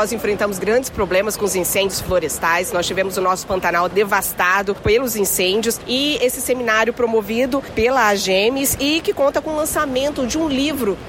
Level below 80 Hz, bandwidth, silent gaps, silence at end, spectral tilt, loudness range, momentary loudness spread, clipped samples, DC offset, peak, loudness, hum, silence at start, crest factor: -42 dBFS; 16.5 kHz; none; 0 s; -3 dB/octave; 1 LU; 4 LU; under 0.1%; under 0.1%; -6 dBFS; -18 LUFS; none; 0 s; 14 dB